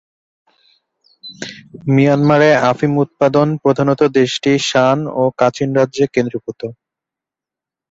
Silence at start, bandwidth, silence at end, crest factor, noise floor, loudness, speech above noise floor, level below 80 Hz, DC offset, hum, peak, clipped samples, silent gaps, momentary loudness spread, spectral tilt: 1.25 s; 8 kHz; 1.2 s; 16 dB; -87 dBFS; -14 LUFS; 73 dB; -56 dBFS; under 0.1%; none; 0 dBFS; under 0.1%; none; 17 LU; -6 dB/octave